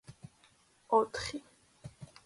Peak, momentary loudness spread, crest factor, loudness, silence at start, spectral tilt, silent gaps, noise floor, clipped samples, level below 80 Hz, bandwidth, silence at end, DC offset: -14 dBFS; 25 LU; 24 dB; -33 LUFS; 0.1 s; -4 dB/octave; none; -67 dBFS; under 0.1%; -64 dBFS; 11.5 kHz; 0.2 s; under 0.1%